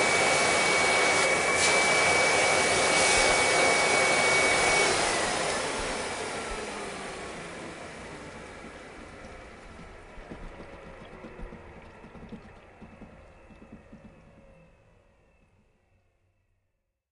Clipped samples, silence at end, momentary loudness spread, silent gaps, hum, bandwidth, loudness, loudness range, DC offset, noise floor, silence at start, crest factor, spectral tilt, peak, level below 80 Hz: under 0.1%; 3.05 s; 24 LU; none; none; 11 kHz; -23 LUFS; 24 LU; under 0.1%; -78 dBFS; 0 s; 18 dB; -1.5 dB/octave; -10 dBFS; -52 dBFS